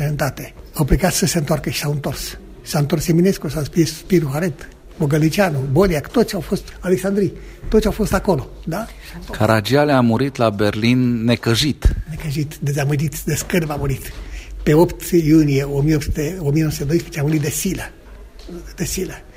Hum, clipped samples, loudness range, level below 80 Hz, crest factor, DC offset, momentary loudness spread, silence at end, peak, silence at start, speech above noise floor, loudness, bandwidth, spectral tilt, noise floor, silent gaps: none; under 0.1%; 3 LU; -32 dBFS; 18 dB; under 0.1%; 12 LU; 0.05 s; 0 dBFS; 0 s; 20 dB; -18 LUFS; 16 kHz; -5.5 dB/octave; -38 dBFS; none